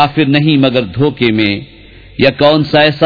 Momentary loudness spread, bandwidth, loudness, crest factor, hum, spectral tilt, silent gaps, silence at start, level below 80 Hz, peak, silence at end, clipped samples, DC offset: 6 LU; 5.4 kHz; -11 LUFS; 10 dB; none; -8 dB/octave; none; 0 s; -40 dBFS; 0 dBFS; 0 s; 0.3%; under 0.1%